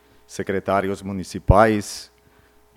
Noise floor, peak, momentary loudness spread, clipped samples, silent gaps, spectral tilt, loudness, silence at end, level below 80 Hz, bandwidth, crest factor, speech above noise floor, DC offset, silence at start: -55 dBFS; 0 dBFS; 17 LU; under 0.1%; none; -6 dB/octave; -21 LUFS; 0.7 s; -34 dBFS; 16 kHz; 22 dB; 35 dB; under 0.1%; 0.3 s